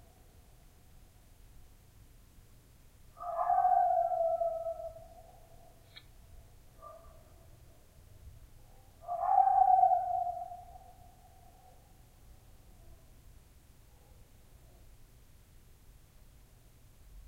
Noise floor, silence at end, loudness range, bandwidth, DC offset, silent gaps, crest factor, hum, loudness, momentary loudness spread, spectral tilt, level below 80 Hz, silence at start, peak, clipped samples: -59 dBFS; 0.05 s; 16 LU; 16 kHz; under 0.1%; none; 22 dB; none; -30 LUFS; 30 LU; -5 dB/octave; -58 dBFS; 3.2 s; -14 dBFS; under 0.1%